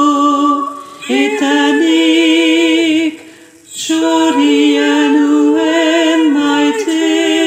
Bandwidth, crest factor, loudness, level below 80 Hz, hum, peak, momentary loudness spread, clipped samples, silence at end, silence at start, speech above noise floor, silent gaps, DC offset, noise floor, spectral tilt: 15.5 kHz; 10 dB; -11 LUFS; -68 dBFS; none; 0 dBFS; 7 LU; under 0.1%; 0 s; 0 s; 28 dB; none; under 0.1%; -38 dBFS; -2 dB/octave